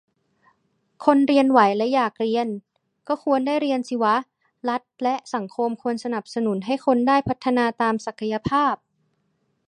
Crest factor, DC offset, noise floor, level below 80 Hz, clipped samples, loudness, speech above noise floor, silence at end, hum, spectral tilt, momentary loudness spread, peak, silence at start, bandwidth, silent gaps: 20 dB; under 0.1%; -70 dBFS; -60 dBFS; under 0.1%; -22 LUFS; 49 dB; 0.9 s; none; -6 dB/octave; 10 LU; -2 dBFS; 1 s; 9.8 kHz; none